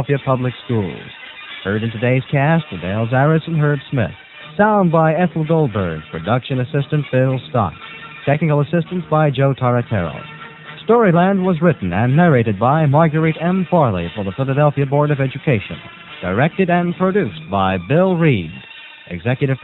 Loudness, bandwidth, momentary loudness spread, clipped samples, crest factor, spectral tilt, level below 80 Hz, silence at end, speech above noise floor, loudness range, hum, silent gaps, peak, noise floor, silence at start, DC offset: -17 LUFS; 4.1 kHz; 15 LU; under 0.1%; 16 dB; -10 dB/octave; -48 dBFS; 0 s; 19 dB; 4 LU; none; none; 0 dBFS; -35 dBFS; 0 s; under 0.1%